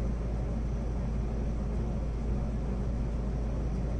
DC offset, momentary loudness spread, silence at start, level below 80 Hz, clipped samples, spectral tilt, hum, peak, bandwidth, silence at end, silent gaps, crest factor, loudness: under 0.1%; 1 LU; 0 s; -32 dBFS; under 0.1%; -8.5 dB/octave; none; -20 dBFS; 6.6 kHz; 0 s; none; 10 dB; -34 LUFS